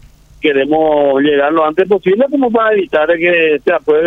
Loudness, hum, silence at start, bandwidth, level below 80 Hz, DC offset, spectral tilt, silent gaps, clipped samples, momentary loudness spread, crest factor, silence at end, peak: -12 LUFS; none; 0.45 s; 4.2 kHz; -48 dBFS; under 0.1%; -7 dB/octave; none; under 0.1%; 3 LU; 12 dB; 0 s; 0 dBFS